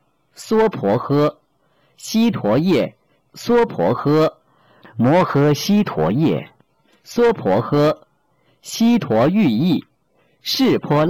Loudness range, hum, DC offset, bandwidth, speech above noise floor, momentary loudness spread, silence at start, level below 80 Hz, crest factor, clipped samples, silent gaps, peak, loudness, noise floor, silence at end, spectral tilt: 2 LU; none; under 0.1%; 17 kHz; 45 dB; 11 LU; 0.4 s; -52 dBFS; 10 dB; under 0.1%; none; -10 dBFS; -17 LUFS; -61 dBFS; 0 s; -6.5 dB/octave